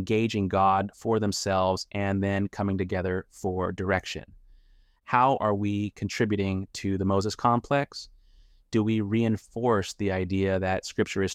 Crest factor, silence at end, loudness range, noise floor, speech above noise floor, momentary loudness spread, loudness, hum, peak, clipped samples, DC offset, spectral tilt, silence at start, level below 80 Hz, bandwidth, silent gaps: 20 dB; 0 s; 2 LU; -59 dBFS; 32 dB; 8 LU; -27 LUFS; none; -6 dBFS; under 0.1%; under 0.1%; -6 dB/octave; 0 s; -56 dBFS; 14 kHz; none